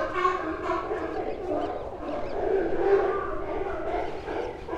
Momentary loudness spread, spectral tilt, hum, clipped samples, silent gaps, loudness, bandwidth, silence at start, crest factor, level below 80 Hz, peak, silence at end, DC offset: 9 LU; -6.5 dB/octave; none; under 0.1%; none; -29 LUFS; 8.2 kHz; 0 s; 16 dB; -44 dBFS; -12 dBFS; 0 s; under 0.1%